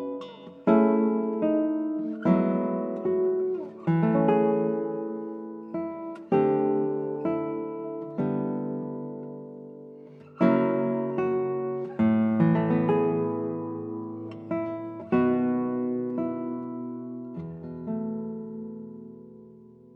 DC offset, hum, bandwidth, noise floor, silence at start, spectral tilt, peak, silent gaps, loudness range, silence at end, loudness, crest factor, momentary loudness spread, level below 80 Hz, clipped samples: under 0.1%; none; 4.5 kHz; -50 dBFS; 0 s; -11 dB/octave; -8 dBFS; none; 7 LU; 0.05 s; -27 LUFS; 18 dB; 16 LU; -72 dBFS; under 0.1%